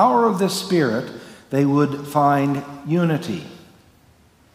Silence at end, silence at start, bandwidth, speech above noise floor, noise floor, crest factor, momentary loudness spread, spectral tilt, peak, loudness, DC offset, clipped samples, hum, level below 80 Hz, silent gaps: 0.95 s; 0 s; 16 kHz; 35 dB; -54 dBFS; 18 dB; 13 LU; -6.5 dB/octave; -4 dBFS; -20 LUFS; under 0.1%; under 0.1%; none; -62 dBFS; none